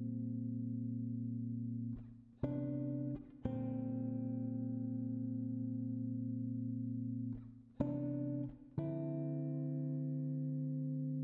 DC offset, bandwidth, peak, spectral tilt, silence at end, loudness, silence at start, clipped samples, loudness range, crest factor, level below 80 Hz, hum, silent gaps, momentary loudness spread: under 0.1%; 3.4 kHz; -22 dBFS; -13 dB/octave; 0 s; -42 LUFS; 0 s; under 0.1%; 1 LU; 20 dB; -66 dBFS; none; none; 4 LU